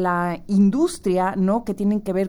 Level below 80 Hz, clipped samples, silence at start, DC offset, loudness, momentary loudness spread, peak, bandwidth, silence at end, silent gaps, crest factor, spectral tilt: -48 dBFS; under 0.1%; 0 s; under 0.1%; -21 LUFS; 4 LU; -8 dBFS; 12.5 kHz; 0 s; none; 12 dB; -7.5 dB/octave